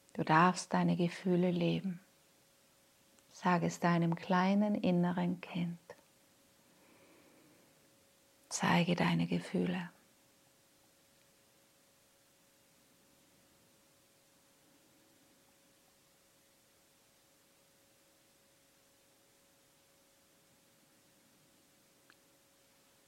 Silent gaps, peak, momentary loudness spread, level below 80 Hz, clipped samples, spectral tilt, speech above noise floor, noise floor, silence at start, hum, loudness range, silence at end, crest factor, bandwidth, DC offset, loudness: none; -12 dBFS; 12 LU; -80 dBFS; under 0.1%; -6 dB/octave; 36 dB; -69 dBFS; 0.15 s; none; 11 LU; 13.2 s; 26 dB; 13.5 kHz; under 0.1%; -33 LUFS